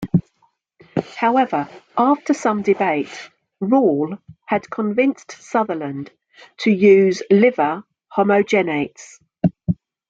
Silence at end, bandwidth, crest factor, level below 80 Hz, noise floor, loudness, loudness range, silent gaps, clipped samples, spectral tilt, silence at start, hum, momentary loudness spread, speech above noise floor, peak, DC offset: 0.35 s; 7.8 kHz; 16 dB; -56 dBFS; -63 dBFS; -19 LUFS; 4 LU; none; under 0.1%; -7 dB/octave; 0 s; none; 14 LU; 45 dB; -2 dBFS; under 0.1%